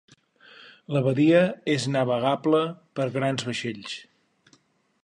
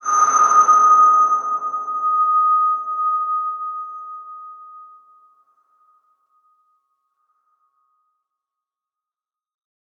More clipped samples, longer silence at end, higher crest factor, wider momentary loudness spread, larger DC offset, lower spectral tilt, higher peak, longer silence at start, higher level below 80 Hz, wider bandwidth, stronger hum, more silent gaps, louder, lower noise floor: neither; second, 1 s vs 5.15 s; about the same, 18 dB vs 16 dB; second, 13 LU vs 22 LU; neither; first, -6 dB/octave vs -0.5 dB/octave; second, -8 dBFS vs -4 dBFS; first, 0.6 s vs 0.05 s; first, -70 dBFS vs -88 dBFS; first, 10.5 kHz vs 6.8 kHz; neither; neither; second, -24 LUFS vs -16 LUFS; second, -63 dBFS vs under -90 dBFS